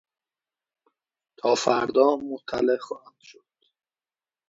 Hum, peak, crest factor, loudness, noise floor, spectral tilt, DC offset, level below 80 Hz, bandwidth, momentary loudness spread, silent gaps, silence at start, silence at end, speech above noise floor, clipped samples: none; -6 dBFS; 22 dB; -24 LUFS; under -90 dBFS; -4 dB/octave; under 0.1%; -68 dBFS; 8 kHz; 12 LU; none; 1.45 s; 1.2 s; over 66 dB; under 0.1%